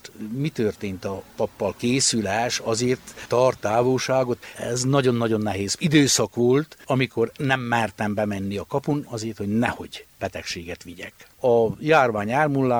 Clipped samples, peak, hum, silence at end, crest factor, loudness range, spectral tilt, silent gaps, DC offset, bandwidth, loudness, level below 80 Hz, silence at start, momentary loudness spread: under 0.1%; -4 dBFS; none; 0 s; 20 dB; 5 LU; -4.5 dB/octave; none; under 0.1%; over 20 kHz; -23 LUFS; -56 dBFS; 0.05 s; 13 LU